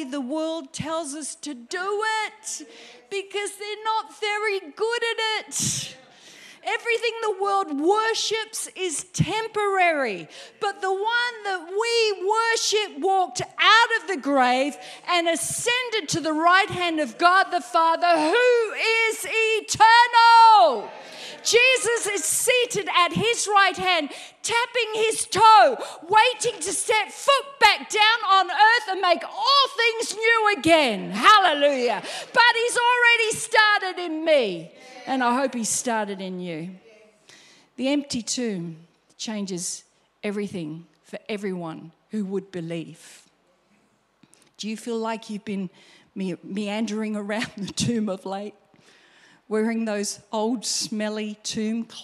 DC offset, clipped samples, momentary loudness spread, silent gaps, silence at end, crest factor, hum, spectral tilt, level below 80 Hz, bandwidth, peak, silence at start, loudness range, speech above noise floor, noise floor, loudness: under 0.1%; under 0.1%; 16 LU; none; 0 s; 20 dB; none; -2.5 dB/octave; -64 dBFS; 15 kHz; -2 dBFS; 0 s; 14 LU; 42 dB; -64 dBFS; -21 LUFS